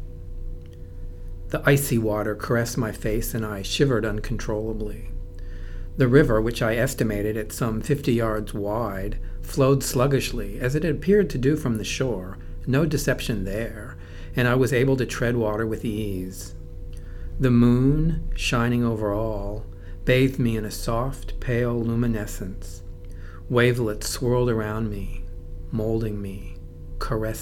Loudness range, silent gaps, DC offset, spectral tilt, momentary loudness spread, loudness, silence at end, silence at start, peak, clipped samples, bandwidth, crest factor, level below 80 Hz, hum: 3 LU; none; under 0.1%; -6 dB/octave; 19 LU; -24 LUFS; 0 s; 0 s; -2 dBFS; under 0.1%; 18 kHz; 22 dB; -34 dBFS; none